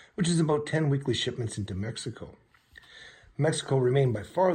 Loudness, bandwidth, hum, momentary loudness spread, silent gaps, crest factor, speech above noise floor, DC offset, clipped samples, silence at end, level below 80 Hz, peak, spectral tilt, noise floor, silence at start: -28 LUFS; 10.5 kHz; none; 21 LU; none; 18 dB; 28 dB; under 0.1%; under 0.1%; 0 s; -60 dBFS; -10 dBFS; -5.5 dB/octave; -55 dBFS; 0.2 s